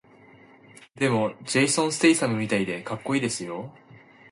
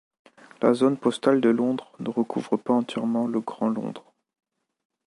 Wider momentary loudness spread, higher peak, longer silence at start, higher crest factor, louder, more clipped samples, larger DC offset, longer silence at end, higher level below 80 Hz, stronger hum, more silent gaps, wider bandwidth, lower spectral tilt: about the same, 12 LU vs 10 LU; about the same, -8 dBFS vs -6 dBFS; first, 1 s vs 0.6 s; about the same, 20 dB vs 20 dB; about the same, -24 LUFS vs -24 LUFS; neither; neither; second, 0.35 s vs 1.05 s; first, -66 dBFS vs -76 dBFS; neither; neither; about the same, 11.5 kHz vs 11.5 kHz; second, -4 dB/octave vs -6.5 dB/octave